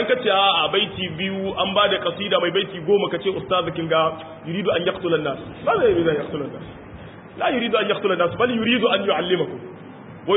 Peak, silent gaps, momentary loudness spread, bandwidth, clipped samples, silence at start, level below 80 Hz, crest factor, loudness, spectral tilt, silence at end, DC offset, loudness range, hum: -4 dBFS; none; 16 LU; 4 kHz; under 0.1%; 0 s; -52 dBFS; 16 dB; -21 LUFS; -10 dB/octave; 0 s; under 0.1%; 3 LU; none